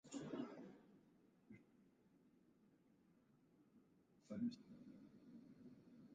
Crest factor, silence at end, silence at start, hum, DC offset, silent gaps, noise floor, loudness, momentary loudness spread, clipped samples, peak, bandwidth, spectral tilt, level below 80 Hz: 22 dB; 0 s; 0.05 s; none; under 0.1%; none; -75 dBFS; -54 LUFS; 19 LU; under 0.1%; -36 dBFS; 8.8 kHz; -6 dB/octave; -90 dBFS